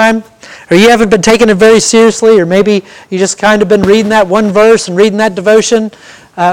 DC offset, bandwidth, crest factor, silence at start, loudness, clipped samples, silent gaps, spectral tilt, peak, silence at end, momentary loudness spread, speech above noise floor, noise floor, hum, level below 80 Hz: under 0.1%; 16.5 kHz; 8 dB; 0 s; -7 LUFS; 3%; none; -4 dB/octave; 0 dBFS; 0 s; 8 LU; 25 dB; -32 dBFS; none; -40 dBFS